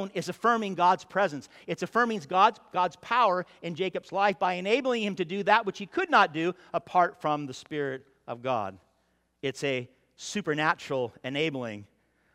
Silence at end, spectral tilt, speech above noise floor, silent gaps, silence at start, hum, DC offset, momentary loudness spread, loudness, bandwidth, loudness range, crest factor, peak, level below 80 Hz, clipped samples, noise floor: 0.5 s; -4.5 dB/octave; 44 dB; none; 0 s; none; under 0.1%; 12 LU; -28 LUFS; 14.5 kHz; 6 LU; 22 dB; -6 dBFS; -74 dBFS; under 0.1%; -72 dBFS